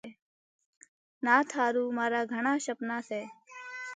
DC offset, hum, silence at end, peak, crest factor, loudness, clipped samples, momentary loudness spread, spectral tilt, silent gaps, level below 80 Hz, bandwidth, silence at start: under 0.1%; none; 0 s; -10 dBFS; 22 dB; -30 LUFS; under 0.1%; 18 LU; -3.5 dB/octave; 0.22-0.59 s, 0.66-0.81 s, 0.88-1.21 s; -86 dBFS; 9.6 kHz; 0.05 s